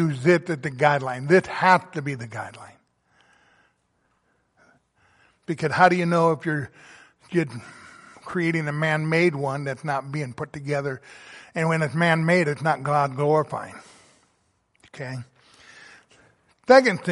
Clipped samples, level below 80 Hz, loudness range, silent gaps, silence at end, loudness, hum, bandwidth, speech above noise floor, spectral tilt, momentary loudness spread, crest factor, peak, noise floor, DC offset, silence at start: under 0.1%; -66 dBFS; 7 LU; none; 0 s; -22 LUFS; none; 11.5 kHz; 47 dB; -6.5 dB/octave; 19 LU; 22 dB; -2 dBFS; -69 dBFS; under 0.1%; 0 s